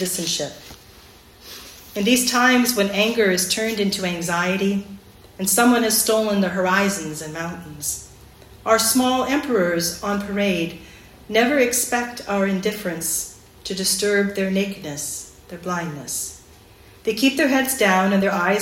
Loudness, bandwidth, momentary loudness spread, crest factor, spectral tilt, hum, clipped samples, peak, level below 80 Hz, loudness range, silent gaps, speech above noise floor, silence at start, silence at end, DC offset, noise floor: -20 LUFS; 16.5 kHz; 14 LU; 18 dB; -3 dB/octave; none; under 0.1%; -4 dBFS; -52 dBFS; 4 LU; none; 27 dB; 0 s; 0 s; under 0.1%; -47 dBFS